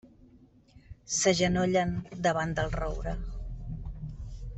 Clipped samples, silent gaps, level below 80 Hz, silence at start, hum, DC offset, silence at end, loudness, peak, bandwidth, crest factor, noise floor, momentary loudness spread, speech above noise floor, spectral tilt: under 0.1%; none; -40 dBFS; 0.05 s; none; under 0.1%; 0 s; -30 LUFS; -12 dBFS; 8.2 kHz; 18 dB; -58 dBFS; 16 LU; 30 dB; -4.5 dB/octave